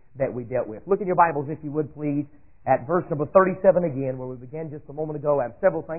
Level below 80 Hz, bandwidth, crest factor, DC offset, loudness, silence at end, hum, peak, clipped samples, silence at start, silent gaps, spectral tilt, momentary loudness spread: -56 dBFS; 2.8 kHz; 20 dB; 0.4%; -24 LUFS; 0 s; none; -2 dBFS; under 0.1%; 0.15 s; none; -14.5 dB/octave; 15 LU